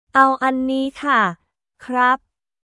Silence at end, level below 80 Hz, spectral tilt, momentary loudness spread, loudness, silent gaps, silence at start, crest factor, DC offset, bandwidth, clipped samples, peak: 0.45 s; -60 dBFS; -5 dB/octave; 7 LU; -18 LUFS; none; 0.15 s; 18 dB; under 0.1%; 11.5 kHz; under 0.1%; 0 dBFS